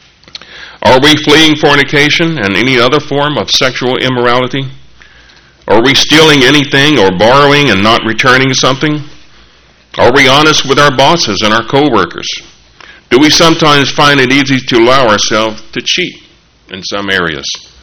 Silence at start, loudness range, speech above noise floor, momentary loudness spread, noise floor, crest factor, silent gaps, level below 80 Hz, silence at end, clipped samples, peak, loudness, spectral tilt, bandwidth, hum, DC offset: 0.5 s; 4 LU; 35 dB; 13 LU; -43 dBFS; 8 dB; none; -36 dBFS; 0.2 s; 2%; 0 dBFS; -7 LUFS; -3.5 dB/octave; over 20 kHz; none; under 0.1%